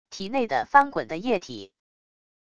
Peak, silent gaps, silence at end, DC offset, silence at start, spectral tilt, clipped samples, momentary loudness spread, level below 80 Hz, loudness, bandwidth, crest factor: -4 dBFS; none; 0.8 s; under 0.1%; 0.1 s; -4.5 dB/octave; under 0.1%; 15 LU; -62 dBFS; -24 LUFS; 8 kHz; 22 dB